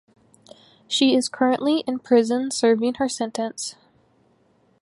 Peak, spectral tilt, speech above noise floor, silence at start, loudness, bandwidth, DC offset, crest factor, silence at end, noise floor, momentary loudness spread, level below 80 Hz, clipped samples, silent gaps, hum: -6 dBFS; -3 dB/octave; 41 dB; 0.9 s; -22 LUFS; 11.5 kHz; under 0.1%; 18 dB; 1.1 s; -61 dBFS; 9 LU; -68 dBFS; under 0.1%; none; none